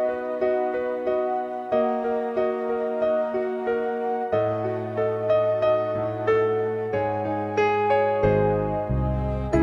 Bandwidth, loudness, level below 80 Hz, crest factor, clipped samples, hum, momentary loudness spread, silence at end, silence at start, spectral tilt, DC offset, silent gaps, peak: 7.2 kHz; -24 LUFS; -40 dBFS; 14 dB; under 0.1%; none; 5 LU; 0 s; 0 s; -8.5 dB/octave; under 0.1%; none; -8 dBFS